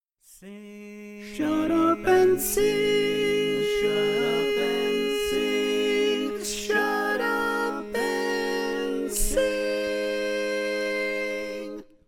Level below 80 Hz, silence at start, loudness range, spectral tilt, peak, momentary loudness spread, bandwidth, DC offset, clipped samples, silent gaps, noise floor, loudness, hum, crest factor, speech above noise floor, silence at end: -44 dBFS; 0.3 s; 4 LU; -3 dB/octave; -10 dBFS; 11 LU; 19 kHz; under 0.1%; under 0.1%; none; -49 dBFS; -25 LUFS; none; 14 dB; 27 dB; 0.25 s